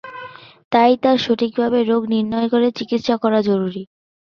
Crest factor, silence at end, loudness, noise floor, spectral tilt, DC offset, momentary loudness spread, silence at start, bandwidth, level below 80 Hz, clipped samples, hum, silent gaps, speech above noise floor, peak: 16 dB; 0.5 s; -18 LUFS; -37 dBFS; -6.5 dB/octave; under 0.1%; 14 LU; 0.05 s; 6.8 kHz; -60 dBFS; under 0.1%; none; 0.64-0.71 s; 20 dB; -2 dBFS